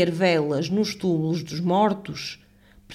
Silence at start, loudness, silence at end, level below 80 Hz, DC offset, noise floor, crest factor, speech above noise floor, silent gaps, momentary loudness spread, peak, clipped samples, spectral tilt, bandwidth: 0 s; -24 LUFS; 0 s; -58 dBFS; under 0.1%; -49 dBFS; 16 dB; 26 dB; none; 12 LU; -8 dBFS; under 0.1%; -6 dB/octave; 14 kHz